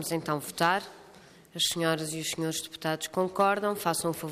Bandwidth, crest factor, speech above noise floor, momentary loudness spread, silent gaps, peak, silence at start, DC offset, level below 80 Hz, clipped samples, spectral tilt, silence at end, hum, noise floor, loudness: 15.5 kHz; 20 dB; 24 dB; 7 LU; none; -10 dBFS; 0 s; under 0.1%; -68 dBFS; under 0.1%; -3.5 dB/octave; 0 s; none; -54 dBFS; -29 LUFS